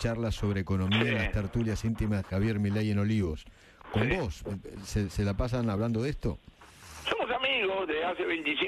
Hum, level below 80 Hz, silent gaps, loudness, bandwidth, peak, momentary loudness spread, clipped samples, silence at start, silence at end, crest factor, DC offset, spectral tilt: none; -44 dBFS; none; -30 LUFS; 13.5 kHz; -14 dBFS; 9 LU; under 0.1%; 0 s; 0 s; 16 dB; under 0.1%; -6 dB/octave